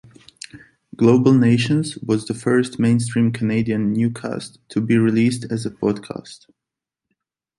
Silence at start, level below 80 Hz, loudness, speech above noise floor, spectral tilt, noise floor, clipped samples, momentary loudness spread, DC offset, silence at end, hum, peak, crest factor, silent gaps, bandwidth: 0.55 s; -56 dBFS; -19 LUFS; 67 dB; -7 dB/octave; -85 dBFS; under 0.1%; 17 LU; under 0.1%; 1.25 s; none; -2 dBFS; 18 dB; none; 11.5 kHz